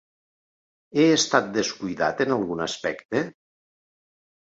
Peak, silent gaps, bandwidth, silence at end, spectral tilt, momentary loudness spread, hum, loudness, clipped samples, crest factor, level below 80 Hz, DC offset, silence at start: -4 dBFS; 3.05-3.09 s; 8 kHz; 1.2 s; -3.5 dB/octave; 9 LU; none; -24 LUFS; under 0.1%; 22 dB; -64 dBFS; under 0.1%; 0.95 s